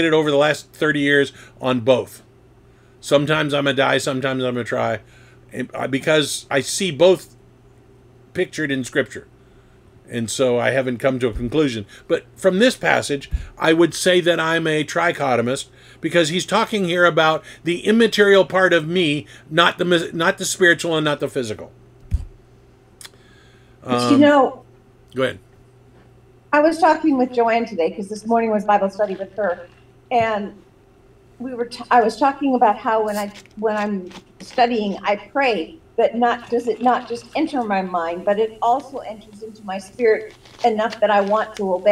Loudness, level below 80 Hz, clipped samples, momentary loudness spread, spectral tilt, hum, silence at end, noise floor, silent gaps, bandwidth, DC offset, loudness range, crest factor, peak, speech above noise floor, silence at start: -19 LUFS; -44 dBFS; under 0.1%; 14 LU; -4.5 dB/octave; none; 0 s; -51 dBFS; none; 16.5 kHz; under 0.1%; 5 LU; 20 dB; 0 dBFS; 32 dB; 0 s